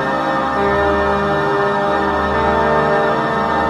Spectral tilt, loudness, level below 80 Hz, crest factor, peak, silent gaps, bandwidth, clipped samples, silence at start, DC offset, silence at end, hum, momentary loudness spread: -6.5 dB/octave; -16 LUFS; -34 dBFS; 12 dB; -4 dBFS; none; 12.5 kHz; under 0.1%; 0 s; under 0.1%; 0 s; none; 2 LU